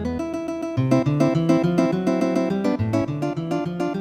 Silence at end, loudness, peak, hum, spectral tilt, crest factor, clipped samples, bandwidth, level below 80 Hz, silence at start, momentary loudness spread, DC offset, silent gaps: 0 s; -22 LUFS; -4 dBFS; none; -8 dB/octave; 18 dB; under 0.1%; 12.5 kHz; -48 dBFS; 0 s; 8 LU; under 0.1%; none